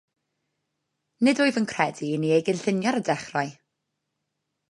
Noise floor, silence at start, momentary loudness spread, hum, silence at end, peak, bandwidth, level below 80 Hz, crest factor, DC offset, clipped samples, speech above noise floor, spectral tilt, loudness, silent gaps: -80 dBFS; 1.2 s; 7 LU; none; 1.2 s; -6 dBFS; 11.5 kHz; -72 dBFS; 22 dB; under 0.1%; under 0.1%; 56 dB; -5.5 dB/octave; -25 LUFS; none